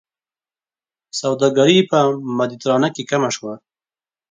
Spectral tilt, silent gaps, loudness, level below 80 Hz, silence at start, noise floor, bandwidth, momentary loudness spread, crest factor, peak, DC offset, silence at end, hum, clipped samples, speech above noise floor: -5 dB/octave; none; -17 LUFS; -66 dBFS; 1.15 s; under -90 dBFS; 9.4 kHz; 14 LU; 20 dB; 0 dBFS; under 0.1%; 0.75 s; none; under 0.1%; over 73 dB